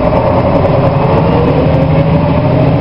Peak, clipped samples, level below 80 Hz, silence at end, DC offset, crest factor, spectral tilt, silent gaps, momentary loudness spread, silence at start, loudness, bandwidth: 0 dBFS; 0.2%; -24 dBFS; 0 s; 2%; 8 dB; -10.5 dB/octave; none; 1 LU; 0 s; -10 LUFS; 5.6 kHz